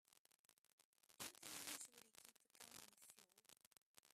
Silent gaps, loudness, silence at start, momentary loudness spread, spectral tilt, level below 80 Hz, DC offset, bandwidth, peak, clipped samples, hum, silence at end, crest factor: 0.18-0.25 s, 0.39-0.49 s, 0.58-0.64 s, 0.73-0.78 s, 0.85-0.93 s, 3.67-3.71 s, 3.78-3.94 s; -57 LUFS; 0.1 s; 17 LU; 0 dB/octave; under -90 dBFS; under 0.1%; 15.5 kHz; -34 dBFS; under 0.1%; none; 0 s; 28 dB